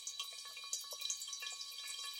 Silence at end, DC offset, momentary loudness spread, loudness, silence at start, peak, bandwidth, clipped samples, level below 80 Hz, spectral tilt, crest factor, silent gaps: 0 s; under 0.1%; 4 LU; -43 LUFS; 0 s; -22 dBFS; 17 kHz; under 0.1%; under -90 dBFS; 5 dB/octave; 24 dB; none